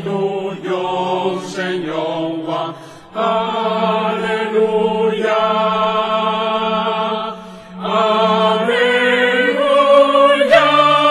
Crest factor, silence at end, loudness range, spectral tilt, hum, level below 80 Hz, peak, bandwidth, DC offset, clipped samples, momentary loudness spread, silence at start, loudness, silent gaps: 16 dB; 0 s; 7 LU; -5 dB/octave; none; -60 dBFS; 0 dBFS; 12 kHz; under 0.1%; under 0.1%; 12 LU; 0 s; -15 LUFS; none